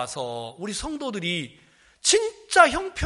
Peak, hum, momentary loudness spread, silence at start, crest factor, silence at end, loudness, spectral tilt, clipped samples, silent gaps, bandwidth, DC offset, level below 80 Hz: -2 dBFS; none; 15 LU; 0 s; 24 dB; 0 s; -23 LUFS; -2.5 dB/octave; under 0.1%; none; 11.5 kHz; under 0.1%; -50 dBFS